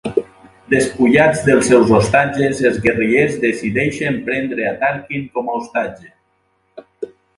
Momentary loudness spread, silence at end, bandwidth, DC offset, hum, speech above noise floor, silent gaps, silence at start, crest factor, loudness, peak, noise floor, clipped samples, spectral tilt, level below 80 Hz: 11 LU; 0.3 s; 11.5 kHz; under 0.1%; none; 47 dB; none; 0.05 s; 16 dB; -15 LUFS; 0 dBFS; -63 dBFS; under 0.1%; -5.5 dB/octave; -46 dBFS